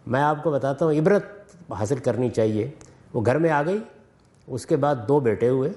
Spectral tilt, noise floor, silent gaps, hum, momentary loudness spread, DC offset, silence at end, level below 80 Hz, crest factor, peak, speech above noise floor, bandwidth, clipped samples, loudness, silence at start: -7.5 dB/octave; -55 dBFS; none; none; 12 LU; under 0.1%; 0 s; -60 dBFS; 16 dB; -8 dBFS; 33 dB; 11.5 kHz; under 0.1%; -23 LUFS; 0.05 s